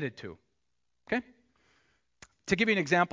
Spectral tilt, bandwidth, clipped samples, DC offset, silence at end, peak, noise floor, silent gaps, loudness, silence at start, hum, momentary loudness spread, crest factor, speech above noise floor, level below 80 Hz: -5 dB/octave; 7.6 kHz; under 0.1%; under 0.1%; 0.05 s; -10 dBFS; -84 dBFS; none; -29 LUFS; 0 s; none; 20 LU; 24 dB; 54 dB; -62 dBFS